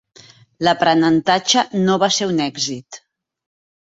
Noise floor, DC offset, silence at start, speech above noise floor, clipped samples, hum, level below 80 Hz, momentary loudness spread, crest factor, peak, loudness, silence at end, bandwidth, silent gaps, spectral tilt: -47 dBFS; under 0.1%; 0.6 s; 30 dB; under 0.1%; none; -60 dBFS; 8 LU; 18 dB; 0 dBFS; -17 LUFS; 1 s; 8 kHz; none; -3.5 dB/octave